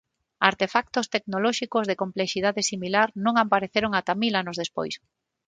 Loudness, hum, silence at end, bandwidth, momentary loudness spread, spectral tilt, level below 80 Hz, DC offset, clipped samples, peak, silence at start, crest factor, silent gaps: -25 LUFS; none; 0.5 s; 9.6 kHz; 8 LU; -3.5 dB/octave; -62 dBFS; under 0.1%; under 0.1%; 0 dBFS; 0.4 s; 24 dB; none